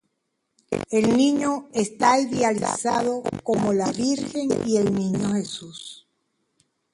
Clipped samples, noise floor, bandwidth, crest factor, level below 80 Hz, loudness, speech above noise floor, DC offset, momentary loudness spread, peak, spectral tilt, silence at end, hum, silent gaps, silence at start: under 0.1%; -76 dBFS; 11.5 kHz; 18 dB; -58 dBFS; -23 LUFS; 54 dB; under 0.1%; 11 LU; -4 dBFS; -5 dB/octave; 1 s; none; none; 0.7 s